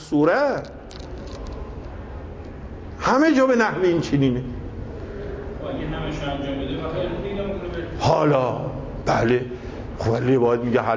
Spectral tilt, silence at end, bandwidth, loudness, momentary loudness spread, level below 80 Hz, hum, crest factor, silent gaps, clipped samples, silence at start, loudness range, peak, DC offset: -7 dB/octave; 0 s; 8 kHz; -22 LUFS; 18 LU; -38 dBFS; none; 16 dB; none; under 0.1%; 0 s; 6 LU; -6 dBFS; under 0.1%